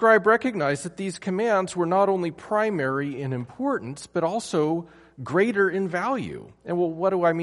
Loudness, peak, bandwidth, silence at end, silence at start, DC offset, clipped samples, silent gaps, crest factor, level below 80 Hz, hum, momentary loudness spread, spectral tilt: -24 LUFS; -6 dBFS; 11.5 kHz; 0 s; 0 s; under 0.1%; under 0.1%; none; 18 dB; -64 dBFS; none; 9 LU; -6 dB/octave